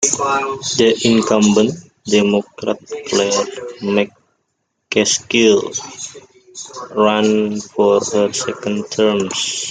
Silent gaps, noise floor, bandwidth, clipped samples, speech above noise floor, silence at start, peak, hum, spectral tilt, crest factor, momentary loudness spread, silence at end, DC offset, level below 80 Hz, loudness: none; -70 dBFS; 9.6 kHz; under 0.1%; 54 dB; 0 s; 0 dBFS; none; -3.5 dB/octave; 16 dB; 12 LU; 0 s; under 0.1%; -58 dBFS; -16 LUFS